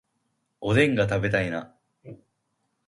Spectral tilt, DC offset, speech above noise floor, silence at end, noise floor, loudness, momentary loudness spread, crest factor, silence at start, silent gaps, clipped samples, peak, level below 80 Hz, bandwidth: -6.5 dB/octave; under 0.1%; 52 dB; 0.7 s; -75 dBFS; -24 LUFS; 13 LU; 20 dB; 0.6 s; none; under 0.1%; -6 dBFS; -52 dBFS; 11.5 kHz